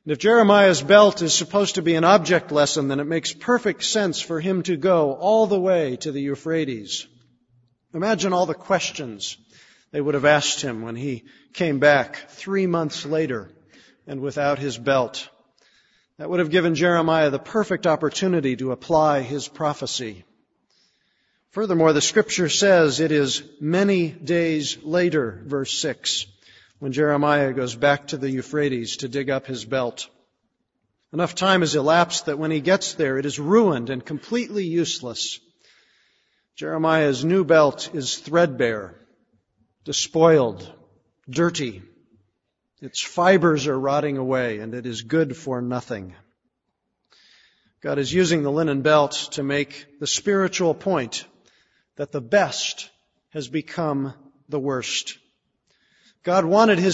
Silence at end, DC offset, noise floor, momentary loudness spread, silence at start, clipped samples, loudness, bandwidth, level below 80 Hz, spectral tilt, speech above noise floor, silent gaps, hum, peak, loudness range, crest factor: 0 s; under 0.1%; -77 dBFS; 14 LU; 0.05 s; under 0.1%; -21 LUFS; 8 kHz; -62 dBFS; -4.5 dB/octave; 56 dB; none; none; 0 dBFS; 6 LU; 22 dB